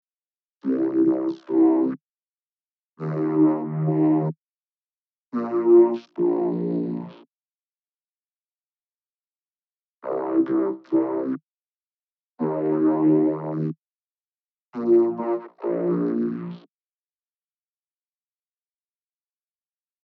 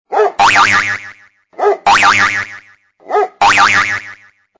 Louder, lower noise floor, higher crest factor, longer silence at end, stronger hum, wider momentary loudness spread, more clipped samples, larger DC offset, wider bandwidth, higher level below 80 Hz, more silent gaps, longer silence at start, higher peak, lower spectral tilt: second, -23 LUFS vs -11 LUFS; first, under -90 dBFS vs -43 dBFS; first, 18 dB vs 12 dB; first, 3.45 s vs 0.45 s; neither; first, 15 LU vs 11 LU; neither; neither; second, 4.3 kHz vs 8 kHz; second, -86 dBFS vs -46 dBFS; first, 2.01-2.93 s, 4.38-5.32 s, 7.36-7.43 s, 7.63-8.76 s, 8.84-10.00 s, 11.43-12.14 s, 12.23-12.36 s, 13.78-14.66 s vs none; first, 0.65 s vs 0.1 s; second, -6 dBFS vs 0 dBFS; first, -12 dB/octave vs -1.5 dB/octave